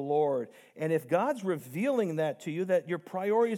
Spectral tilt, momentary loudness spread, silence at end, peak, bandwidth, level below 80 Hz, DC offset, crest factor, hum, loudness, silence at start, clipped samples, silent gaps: -7 dB/octave; 7 LU; 0 s; -12 dBFS; 17 kHz; under -90 dBFS; under 0.1%; 16 dB; none; -31 LUFS; 0 s; under 0.1%; none